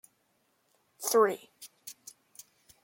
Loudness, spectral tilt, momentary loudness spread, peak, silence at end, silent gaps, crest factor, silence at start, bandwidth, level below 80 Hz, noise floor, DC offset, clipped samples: -28 LUFS; -2 dB/octave; 26 LU; -12 dBFS; 0.9 s; none; 22 dB; 1 s; 17 kHz; -86 dBFS; -74 dBFS; under 0.1%; under 0.1%